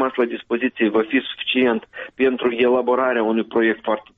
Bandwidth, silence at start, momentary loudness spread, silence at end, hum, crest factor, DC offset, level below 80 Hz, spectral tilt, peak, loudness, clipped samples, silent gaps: 4 kHz; 0 s; 5 LU; 0.2 s; none; 14 dB; under 0.1%; -62 dBFS; -2 dB/octave; -6 dBFS; -20 LUFS; under 0.1%; none